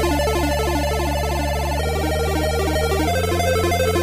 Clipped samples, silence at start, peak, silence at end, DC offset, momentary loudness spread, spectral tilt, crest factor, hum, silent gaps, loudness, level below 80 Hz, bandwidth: under 0.1%; 0 s; -8 dBFS; 0 s; under 0.1%; 3 LU; -5 dB/octave; 12 dB; none; none; -20 LUFS; -26 dBFS; 16 kHz